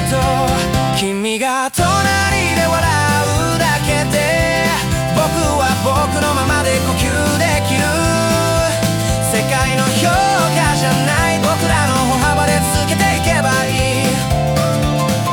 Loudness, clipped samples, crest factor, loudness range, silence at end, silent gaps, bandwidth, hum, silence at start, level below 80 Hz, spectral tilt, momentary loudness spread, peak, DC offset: -14 LUFS; under 0.1%; 12 dB; 1 LU; 0 s; none; over 20 kHz; none; 0 s; -30 dBFS; -4.5 dB/octave; 2 LU; -2 dBFS; under 0.1%